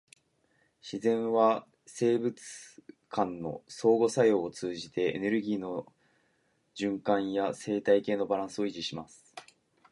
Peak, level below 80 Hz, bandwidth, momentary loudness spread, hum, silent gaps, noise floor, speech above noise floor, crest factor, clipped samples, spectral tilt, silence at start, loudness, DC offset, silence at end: -12 dBFS; -72 dBFS; 11.5 kHz; 21 LU; none; none; -73 dBFS; 43 dB; 20 dB; under 0.1%; -5.5 dB/octave; 0.85 s; -30 LUFS; under 0.1%; 0.5 s